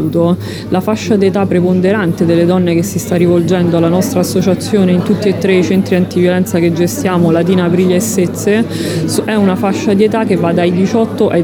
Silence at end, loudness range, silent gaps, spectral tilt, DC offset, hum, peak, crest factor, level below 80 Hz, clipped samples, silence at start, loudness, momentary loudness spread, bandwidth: 0 s; 1 LU; none; -6.5 dB/octave; under 0.1%; none; 0 dBFS; 10 dB; -46 dBFS; under 0.1%; 0 s; -12 LUFS; 3 LU; 19 kHz